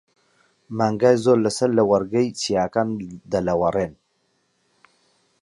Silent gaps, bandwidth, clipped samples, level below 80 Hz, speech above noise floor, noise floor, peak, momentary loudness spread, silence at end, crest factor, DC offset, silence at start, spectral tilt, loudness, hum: none; 11.5 kHz; under 0.1%; -54 dBFS; 48 dB; -68 dBFS; -4 dBFS; 9 LU; 1.5 s; 18 dB; under 0.1%; 0.7 s; -5.5 dB/octave; -21 LUFS; none